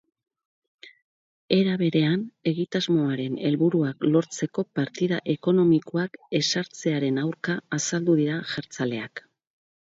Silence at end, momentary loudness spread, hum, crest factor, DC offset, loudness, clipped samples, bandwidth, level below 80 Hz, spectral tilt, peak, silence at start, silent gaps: 0.7 s; 8 LU; none; 20 dB; under 0.1%; -25 LUFS; under 0.1%; 7.8 kHz; -68 dBFS; -5.5 dB/octave; -6 dBFS; 0.85 s; 1.02-1.48 s